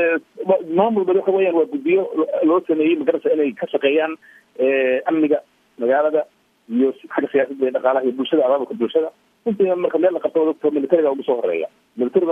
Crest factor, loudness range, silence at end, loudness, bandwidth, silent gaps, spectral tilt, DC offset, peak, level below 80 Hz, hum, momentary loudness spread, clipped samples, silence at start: 16 dB; 2 LU; 0 s; -19 LUFS; 3.7 kHz; none; -8 dB/octave; under 0.1%; -2 dBFS; -70 dBFS; none; 7 LU; under 0.1%; 0 s